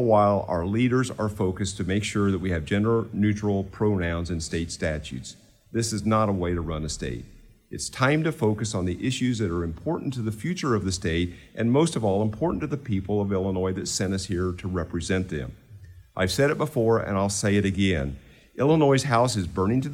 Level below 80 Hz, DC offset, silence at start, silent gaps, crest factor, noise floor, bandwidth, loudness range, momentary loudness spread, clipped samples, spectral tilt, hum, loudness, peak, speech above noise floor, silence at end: -46 dBFS; under 0.1%; 0 s; none; 18 dB; -47 dBFS; 16 kHz; 4 LU; 9 LU; under 0.1%; -5.5 dB/octave; none; -25 LUFS; -8 dBFS; 22 dB; 0 s